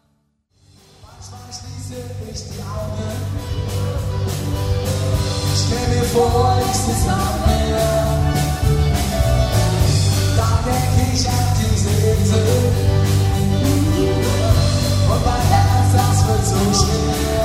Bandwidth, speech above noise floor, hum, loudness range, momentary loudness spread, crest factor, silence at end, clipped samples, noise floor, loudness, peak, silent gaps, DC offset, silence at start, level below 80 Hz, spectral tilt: 16 kHz; 46 dB; none; 9 LU; 11 LU; 16 dB; 0 s; under 0.1%; -63 dBFS; -17 LUFS; -2 dBFS; none; under 0.1%; 1.05 s; -26 dBFS; -5.5 dB/octave